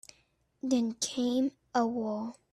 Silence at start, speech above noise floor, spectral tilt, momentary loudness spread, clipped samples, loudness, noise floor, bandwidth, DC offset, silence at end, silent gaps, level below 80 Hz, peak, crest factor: 0.65 s; 40 dB; -3.5 dB/octave; 7 LU; under 0.1%; -32 LUFS; -71 dBFS; 13 kHz; under 0.1%; 0.2 s; none; -72 dBFS; -16 dBFS; 16 dB